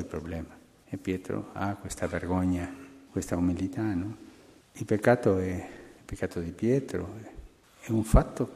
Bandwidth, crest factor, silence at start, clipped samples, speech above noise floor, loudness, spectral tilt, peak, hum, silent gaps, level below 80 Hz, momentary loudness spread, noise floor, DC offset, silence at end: 15 kHz; 24 dB; 0 s; under 0.1%; 26 dB; -30 LUFS; -7 dB/octave; -6 dBFS; none; none; -40 dBFS; 20 LU; -54 dBFS; under 0.1%; 0 s